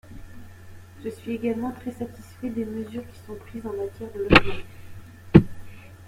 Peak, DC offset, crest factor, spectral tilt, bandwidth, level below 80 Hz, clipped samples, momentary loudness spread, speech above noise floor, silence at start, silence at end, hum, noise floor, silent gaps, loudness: 0 dBFS; under 0.1%; 26 dB; -7 dB/octave; 16 kHz; -42 dBFS; under 0.1%; 24 LU; 17 dB; 0.1 s; 0 s; none; -43 dBFS; none; -24 LUFS